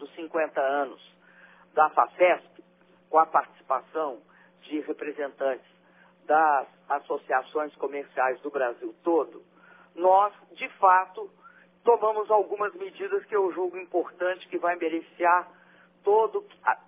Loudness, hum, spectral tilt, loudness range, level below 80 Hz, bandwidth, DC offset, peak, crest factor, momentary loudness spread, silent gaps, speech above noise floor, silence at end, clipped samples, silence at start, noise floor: -26 LUFS; none; -7.5 dB/octave; 4 LU; -90 dBFS; 3.8 kHz; under 0.1%; -6 dBFS; 20 dB; 12 LU; none; 34 dB; 0.1 s; under 0.1%; 0 s; -60 dBFS